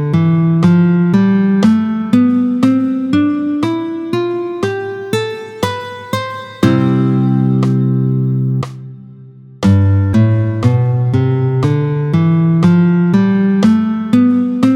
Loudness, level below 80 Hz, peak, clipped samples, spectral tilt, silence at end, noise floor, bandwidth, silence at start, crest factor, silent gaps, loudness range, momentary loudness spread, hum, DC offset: -13 LUFS; -48 dBFS; 0 dBFS; under 0.1%; -8.5 dB/octave; 0 s; -36 dBFS; 12 kHz; 0 s; 12 dB; none; 5 LU; 9 LU; none; under 0.1%